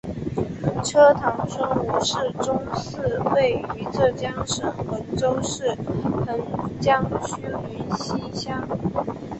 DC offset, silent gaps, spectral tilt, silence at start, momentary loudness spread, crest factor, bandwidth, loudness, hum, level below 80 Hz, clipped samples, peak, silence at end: under 0.1%; none; -5 dB/octave; 0.05 s; 9 LU; 20 dB; 8.6 kHz; -24 LUFS; none; -46 dBFS; under 0.1%; -4 dBFS; 0 s